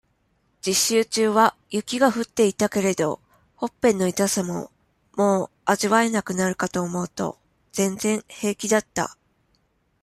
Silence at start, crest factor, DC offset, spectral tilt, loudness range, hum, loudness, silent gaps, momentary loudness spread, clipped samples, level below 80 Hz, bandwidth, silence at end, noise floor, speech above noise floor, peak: 0.65 s; 20 dB; under 0.1%; -4 dB/octave; 4 LU; none; -23 LUFS; none; 12 LU; under 0.1%; -62 dBFS; 15 kHz; 0.9 s; -67 dBFS; 45 dB; -4 dBFS